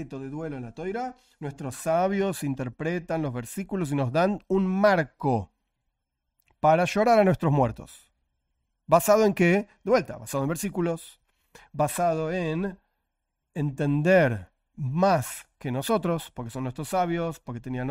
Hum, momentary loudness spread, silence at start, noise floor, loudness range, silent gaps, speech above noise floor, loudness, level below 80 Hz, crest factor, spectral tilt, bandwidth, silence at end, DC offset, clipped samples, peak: none; 15 LU; 0 s; -81 dBFS; 6 LU; none; 56 dB; -26 LUFS; -54 dBFS; 20 dB; -6 dB/octave; 16 kHz; 0 s; under 0.1%; under 0.1%; -6 dBFS